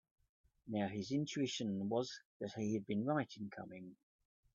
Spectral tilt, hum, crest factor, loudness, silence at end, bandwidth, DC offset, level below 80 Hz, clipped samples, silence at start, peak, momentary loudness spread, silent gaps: -5.5 dB/octave; none; 18 dB; -41 LUFS; 0.6 s; 7.8 kHz; under 0.1%; -78 dBFS; under 0.1%; 0.65 s; -24 dBFS; 13 LU; 2.25-2.40 s